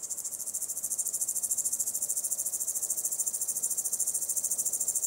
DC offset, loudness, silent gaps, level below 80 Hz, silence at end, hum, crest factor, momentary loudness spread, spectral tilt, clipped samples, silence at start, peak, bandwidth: under 0.1%; -29 LUFS; none; -78 dBFS; 0 s; none; 20 dB; 4 LU; 1 dB/octave; under 0.1%; 0 s; -12 dBFS; 16 kHz